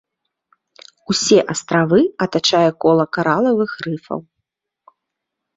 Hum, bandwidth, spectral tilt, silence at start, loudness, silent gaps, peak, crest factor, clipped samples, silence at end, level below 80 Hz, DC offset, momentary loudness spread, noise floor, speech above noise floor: none; 8 kHz; -4.5 dB/octave; 1.1 s; -16 LUFS; none; -2 dBFS; 16 dB; under 0.1%; 1.35 s; -58 dBFS; under 0.1%; 12 LU; -80 dBFS; 63 dB